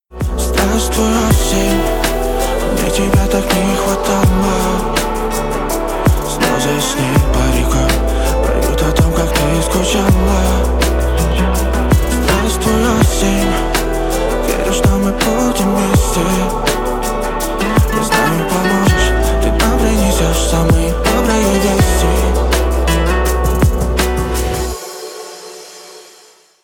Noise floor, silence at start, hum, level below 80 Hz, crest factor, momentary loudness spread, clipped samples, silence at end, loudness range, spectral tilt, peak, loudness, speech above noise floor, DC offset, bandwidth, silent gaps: -45 dBFS; 0.1 s; none; -18 dBFS; 12 dB; 5 LU; under 0.1%; 0.6 s; 2 LU; -5 dB/octave; 0 dBFS; -14 LUFS; 32 dB; under 0.1%; 19 kHz; none